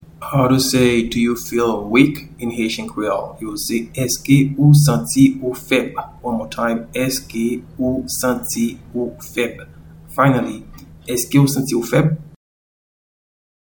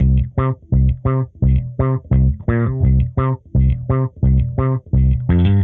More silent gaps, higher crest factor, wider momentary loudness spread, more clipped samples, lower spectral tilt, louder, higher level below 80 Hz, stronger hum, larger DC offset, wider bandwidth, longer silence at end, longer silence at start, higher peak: neither; first, 18 dB vs 12 dB; first, 12 LU vs 4 LU; neither; second, -5.5 dB/octave vs -10 dB/octave; about the same, -18 LUFS vs -17 LUFS; second, -44 dBFS vs -20 dBFS; neither; neither; first, 19.5 kHz vs 3.7 kHz; first, 1.35 s vs 0 s; first, 0.2 s vs 0 s; first, 0 dBFS vs -4 dBFS